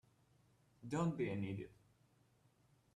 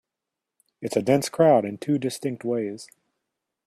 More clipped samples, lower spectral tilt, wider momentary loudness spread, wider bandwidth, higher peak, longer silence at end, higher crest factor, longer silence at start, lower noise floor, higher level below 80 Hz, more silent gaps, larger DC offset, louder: neither; first, -7.5 dB/octave vs -6 dB/octave; about the same, 16 LU vs 14 LU; second, 11 kHz vs 15 kHz; second, -28 dBFS vs -6 dBFS; first, 1.2 s vs 0.8 s; about the same, 18 dB vs 20 dB; about the same, 0.8 s vs 0.8 s; second, -74 dBFS vs -86 dBFS; second, -76 dBFS vs -66 dBFS; neither; neither; second, -42 LUFS vs -24 LUFS